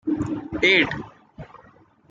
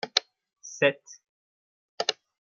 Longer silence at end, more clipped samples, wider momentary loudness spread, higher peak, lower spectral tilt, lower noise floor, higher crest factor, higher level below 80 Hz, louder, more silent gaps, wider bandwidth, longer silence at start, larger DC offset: first, 0.65 s vs 0.35 s; neither; about the same, 17 LU vs 18 LU; about the same, -4 dBFS vs -2 dBFS; first, -5 dB/octave vs -2 dB/octave; second, -54 dBFS vs under -90 dBFS; second, 20 dB vs 30 dB; first, -50 dBFS vs -82 dBFS; first, -20 LUFS vs -27 LUFS; second, none vs 1.29-1.98 s; about the same, 7.8 kHz vs 7.4 kHz; about the same, 0.05 s vs 0.05 s; neither